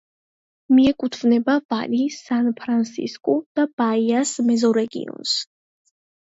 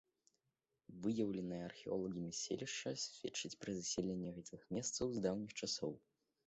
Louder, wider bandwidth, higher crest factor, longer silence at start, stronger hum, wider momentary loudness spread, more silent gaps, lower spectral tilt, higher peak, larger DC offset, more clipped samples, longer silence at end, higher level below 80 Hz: first, -21 LUFS vs -43 LUFS; about the same, 8 kHz vs 8.2 kHz; second, 14 dB vs 20 dB; second, 0.7 s vs 0.9 s; neither; about the same, 7 LU vs 7 LU; first, 1.65-1.69 s, 3.46-3.55 s, 3.73-3.78 s vs none; about the same, -4 dB/octave vs -4 dB/octave; first, -6 dBFS vs -24 dBFS; neither; neither; first, 0.9 s vs 0.5 s; first, -60 dBFS vs -72 dBFS